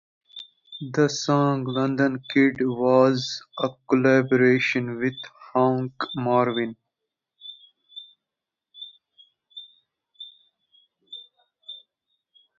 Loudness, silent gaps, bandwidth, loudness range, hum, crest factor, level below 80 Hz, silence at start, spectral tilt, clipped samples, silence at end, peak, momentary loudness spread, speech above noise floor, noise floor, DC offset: -22 LUFS; none; 7.4 kHz; 23 LU; none; 20 dB; -68 dBFS; 0.35 s; -6 dB/octave; under 0.1%; 0.8 s; -4 dBFS; 23 LU; 65 dB; -87 dBFS; under 0.1%